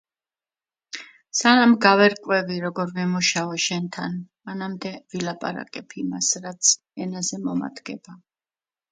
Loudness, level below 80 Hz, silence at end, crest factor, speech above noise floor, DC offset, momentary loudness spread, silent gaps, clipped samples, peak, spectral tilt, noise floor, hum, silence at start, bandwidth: -22 LUFS; -70 dBFS; 0.75 s; 24 dB; over 67 dB; under 0.1%; 20 LU; none; under 0.1%; 0 dBFS; -3 dB/octave; under -90 dBFS; none; 0.95 s; 9.6 kHz